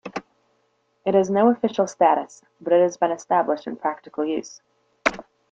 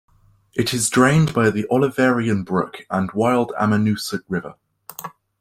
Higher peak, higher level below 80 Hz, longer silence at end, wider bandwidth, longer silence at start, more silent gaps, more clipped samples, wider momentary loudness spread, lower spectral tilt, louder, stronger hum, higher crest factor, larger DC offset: about the same, -2 dBFS vs -2 dBFS; second, -64 dBFS vs -52 dBFS; about the same, 0.3 s vs 0.3 s; second, 8.6 kHz vs 16.5 kHz; second, 0.05 s vs 0.55 s; neither; neither; second, 16 LU vs 19 LU; about the same, -5.5 dB/octave vs -5.5 dB/octave; second, -22 LUFS vs -19 LUFS; neither; about the same, 22 dB vs 18 dB; neither